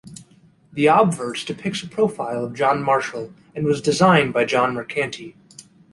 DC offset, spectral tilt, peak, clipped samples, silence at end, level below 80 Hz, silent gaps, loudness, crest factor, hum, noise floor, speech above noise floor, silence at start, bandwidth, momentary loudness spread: under 0.1%; -5.5 dB/octave; -2 dBFS; under 0.1%; 0.3 s; -58 dBFS; none; -20 LUFS; 18 dB; none; -53 dBFS; 34 dB; 0.05 s; 11.5 kHz; 15 LU